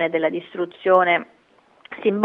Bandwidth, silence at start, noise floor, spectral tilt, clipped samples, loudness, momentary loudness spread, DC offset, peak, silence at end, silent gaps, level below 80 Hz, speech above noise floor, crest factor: 4.1 kHz; 0 s; -57 dBFS; -8 dB/octave; under 0.1%; -21 LUFS; 12 LU; under 0.1%; -2 dBFS; 0 s; none; -72 dBFS; 36 dB; 18 dB